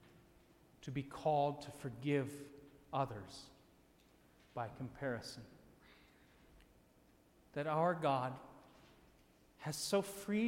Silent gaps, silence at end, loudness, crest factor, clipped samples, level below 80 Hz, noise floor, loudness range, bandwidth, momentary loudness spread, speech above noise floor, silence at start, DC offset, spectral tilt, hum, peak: none; 0 s; -40 LUFS; 20 dB; under 0.1%; -72 dBFS; -69 dBFS; 9 LU; 16.5 kHz; 19 LU; 30 dB; 0.05 s; under 0.1%; -5.5 dB/octave; none; -24 dBFS